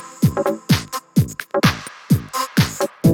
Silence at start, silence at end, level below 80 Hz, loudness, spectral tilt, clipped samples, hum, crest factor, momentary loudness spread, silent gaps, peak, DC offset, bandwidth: 0 s; 0 s; -42 dBFS; -20 LUFS; -5.5 dB/octave; under 0.1%; none; 16 dB; 3 LU; none; -2 dBFS; under 0.1%; 18.5 kHz